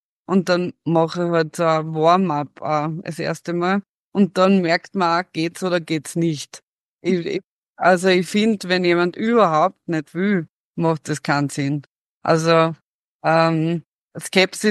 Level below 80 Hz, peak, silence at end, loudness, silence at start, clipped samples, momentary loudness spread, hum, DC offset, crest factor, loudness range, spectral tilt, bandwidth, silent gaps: -68 dBFS; -2 dBFS; 0 s; -20 LUFS; 0.3 s; under 0.1%; 10 LU; none; under 0.1%; 18 dB; 3 LU; -5.5 dB/octave; 12.5 kHz; 3.89-4.12 s, 6.63-6.99 s, 7.46-7.74 s, 10.49-10.74 s, 11.87-12.21 s, 12.84-13.19 s, 13.86-14.08 s